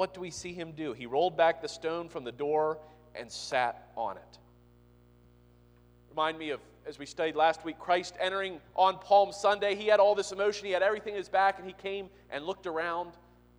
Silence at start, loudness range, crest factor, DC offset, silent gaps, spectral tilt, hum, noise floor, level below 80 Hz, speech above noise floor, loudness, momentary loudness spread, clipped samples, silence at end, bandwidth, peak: 0 s; 11 LU; 20 dB; under 0.1%; none; -3.5 dB/octave; 60 Hz at -60 dBFS; -60 dBFS; -64 dBFS; 30 dB; -30 LUFS; 15 LU; under 0.1%; 0.5 s; 11 kHz; -10 dBFS